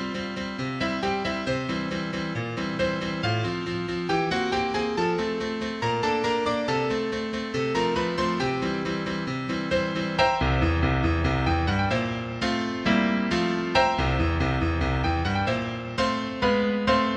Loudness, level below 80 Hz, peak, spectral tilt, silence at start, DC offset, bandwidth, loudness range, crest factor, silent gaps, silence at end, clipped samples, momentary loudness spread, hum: -26 LUFS; -38 dBFS; -6 dBFS; -6 dB/octave; 0 s; under 0.1%; 9.8 kHz; 3 LU; 18 dB; none; 0 s; under 0.1%; 6 LU; none